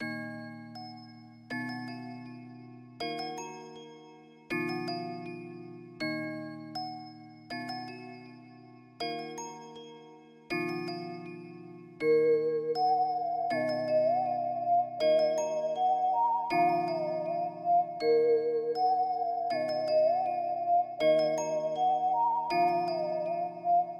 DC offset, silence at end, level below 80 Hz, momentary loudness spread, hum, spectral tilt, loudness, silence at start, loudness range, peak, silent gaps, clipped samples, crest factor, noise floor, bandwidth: under 0.1%; 0 s; -78 dBFS; 19 LU; none; -5 dB/octave; -30 LUFS; 0 s; 12 LU; -16 dBFS; none; under 0.1%; 14 dB; -54 dBFS; 12.5 kHz